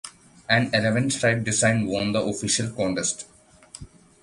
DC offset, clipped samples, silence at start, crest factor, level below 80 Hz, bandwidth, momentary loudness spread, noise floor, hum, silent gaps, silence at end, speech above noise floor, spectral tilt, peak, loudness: under 0.1%; under 0.1%; 0.05 s; 20 dB; -54 dBFS; 11.5 kHz; 22 LU; -46 dBFS; none; none; 0.35 s; 23 dB; -4 dB/octave; -4 dBFS; -23 LUFS